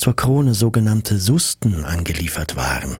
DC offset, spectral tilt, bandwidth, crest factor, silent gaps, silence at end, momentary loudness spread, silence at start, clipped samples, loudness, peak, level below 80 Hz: under 0.1%; -5 dB/octave; 16.5 kHz; 14 dB; none; 0 s; 6 LU; 0 s; under 0.1%; -18 LUFS; -4 dBFS; -32 dBFS